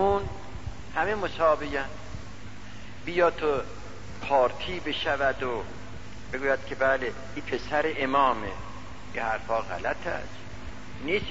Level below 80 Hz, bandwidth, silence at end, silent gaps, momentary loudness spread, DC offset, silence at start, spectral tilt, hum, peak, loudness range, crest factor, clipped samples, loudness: -46 dBFS; 8 kHz; 0 s; none; 18 LU; 1%; 0 s; -5 dB/octave; none; -12 dBFS; 2 LU; 18 dB; under 0.1%; -28 LUFS